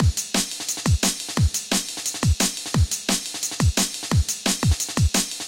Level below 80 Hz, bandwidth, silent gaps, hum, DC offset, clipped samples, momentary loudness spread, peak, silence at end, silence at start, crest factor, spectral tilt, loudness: -30 dBFS; 17 kHz; none; none; under 0.1%; under 0.1%; 3 LU; -4 dBFS; 0 s; 0 s; 18 dB; -3.5 dB/octave; -22 LUFS